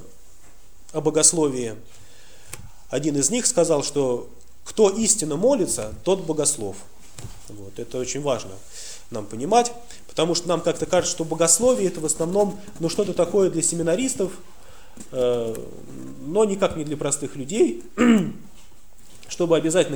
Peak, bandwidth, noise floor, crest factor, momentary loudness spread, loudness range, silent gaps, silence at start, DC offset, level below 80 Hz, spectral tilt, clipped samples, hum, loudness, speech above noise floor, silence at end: -2 dBFS; over 20 kHz; -52 dBFS; 22 dB; 21 LU; 5 LU; none; 0 s; 1%; -52 dBFS; -3.5 dB/octave; under 0.1%; none; -22 LUFS; 29 dB; 0 s